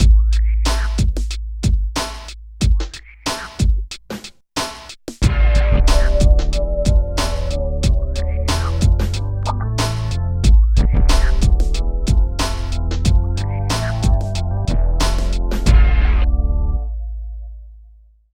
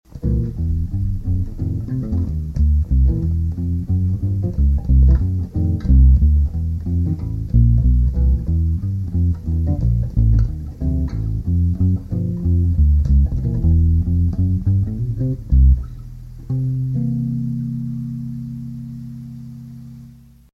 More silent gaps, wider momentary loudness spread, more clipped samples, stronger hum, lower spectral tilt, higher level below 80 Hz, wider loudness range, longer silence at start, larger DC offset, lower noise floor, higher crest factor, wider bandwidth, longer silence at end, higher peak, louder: neither; about the same, 12 LU vs 13 LU; neither; neither; second, -5.5 dB/octave vs -11 dB/octave; about the same, -16 dBFS vs -20 dBFS; second, 4 LU vs 7 LU; second, 0 s vs 0.15 s; neither; about the same, -46 dBFS vs -43 dBFS; about the same, 14 dB vs 14 dB; first, 12 kHz vs 1.8 kHz; first, 0.55 s vs 0.4 s; about the same, 0 dBFS vs -2 dBFS; about the same, -19 LUFS vs -19 LUFS